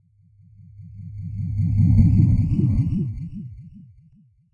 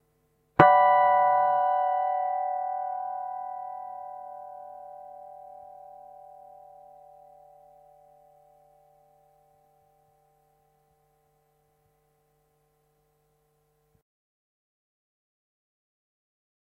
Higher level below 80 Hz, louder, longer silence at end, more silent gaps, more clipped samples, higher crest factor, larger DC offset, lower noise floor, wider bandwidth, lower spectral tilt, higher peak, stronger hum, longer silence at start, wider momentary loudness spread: first, -32 dBFS vs -68 dBFS; first, -20 LUFS vs -24 LUFS; second, 0.75 s vs 11 s; neither; neither; second, 18 dB vs 30 dB; neither; second, -55 dBFS vs -70 dBFS; about the same, 4.5 kHz vs 4.2 kHz; first, -11.5 dB/octave vs -7.5 dB/octave; second, -4 dBFS vs 0 dBFS; neither; first, 0.8 s vs 0.6 s; second, 23 LU vs 28 LU